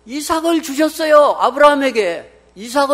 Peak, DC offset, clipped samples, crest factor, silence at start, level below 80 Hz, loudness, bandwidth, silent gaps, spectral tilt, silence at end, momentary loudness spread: 0 dBFS; under 0.1%; 0.2%; 14 dB; 0.05 s; -52 dBFS; -14 LUFS; 16.5 kHz; none; -2.5 dB/octave; 0 s; 10 LU